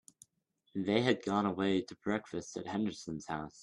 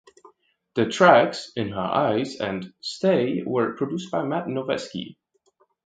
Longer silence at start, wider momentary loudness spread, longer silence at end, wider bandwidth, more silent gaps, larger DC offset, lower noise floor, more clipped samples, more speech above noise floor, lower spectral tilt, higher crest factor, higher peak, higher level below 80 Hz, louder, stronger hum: about the same, 0.75 s vs 0.75 s; second, 11 LU vs 15 LU; second, 0 s vs 0.75 s; first, 11.5 kHz vs 9.2 kHz; neither; neither; first, -78 dBFS vs -66 dBFS; neither; about the same, 43 dB vs 43 dB; about the same, -5.5 dB/octave vs -5.5 dB/octave; about the same, 20 dB vs 24 dB; second, -14 dBFS vs 0 dBFS; second, -70 dBFS vs -62 dBFS; second, -35 LUFS vs -23 LUFS; neither